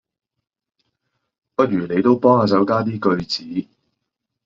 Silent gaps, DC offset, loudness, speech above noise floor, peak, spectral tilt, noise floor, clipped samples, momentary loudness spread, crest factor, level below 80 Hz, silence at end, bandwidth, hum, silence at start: none; under 0.1%; -18 LUFS; 62 dB; -2 dBFS; -5.5 dB/octave; -79 dBFS; under 0.1%; 13 LU; 18 dB; -56 dBFS; 0.85 s; 7.6 kHz; none; 1.6 s